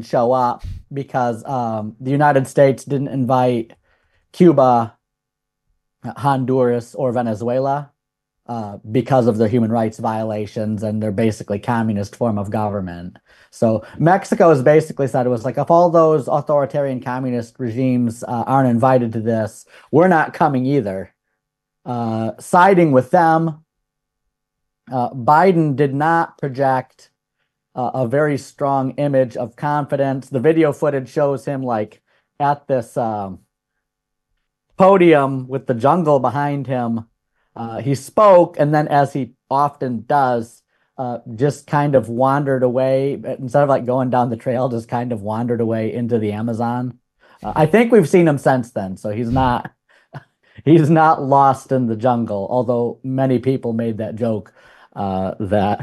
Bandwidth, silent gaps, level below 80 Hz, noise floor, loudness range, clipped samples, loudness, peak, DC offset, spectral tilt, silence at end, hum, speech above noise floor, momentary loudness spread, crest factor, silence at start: 12.5 kHz; none; -50 dBFS; -80 dBFS; 5 LU; under 0.1%; -17 LUFS; 0 dBFS; under 0.1%; -8 dB/octave; 0 s; none; 63 dB; 12 LU; 16 dB; 0 s